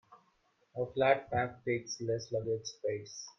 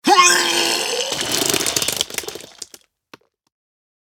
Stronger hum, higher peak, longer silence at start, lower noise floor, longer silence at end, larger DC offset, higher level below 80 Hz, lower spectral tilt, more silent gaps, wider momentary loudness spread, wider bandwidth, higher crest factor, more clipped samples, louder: neither; second, -14 dBFS vs 0 dBFS; about the same, 0.1 s vs 0.05 s; first, -73 dBFS vs -49 dBFS; second, 0.05 s vs 1.35 s; neither; second, -68 dBFS vs -58 dBFS; first, -4.5 dB/octave vs -0.5 dB/octave; neither; second, 10 LU vs 23 LU; second, 7.4 kHz vs over 20 kHz; about the same, 22 dB vs 20 dB; neither; second, -35 LUFS vs -16 LUFS